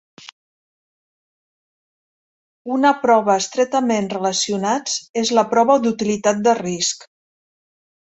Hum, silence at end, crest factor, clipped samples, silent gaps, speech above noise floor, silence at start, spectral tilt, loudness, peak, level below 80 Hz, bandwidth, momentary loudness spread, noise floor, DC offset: none; 1.15 s; 18 dB; under 0.1%; 5.09-5.14 s; over 72 dB; 2.65 s; -3.5 dB/octave; -18 LUFS; -2 dBFS; -64 dBFS; 8.2 kHz; 7 LU; under -90 dBFS; under 0.1%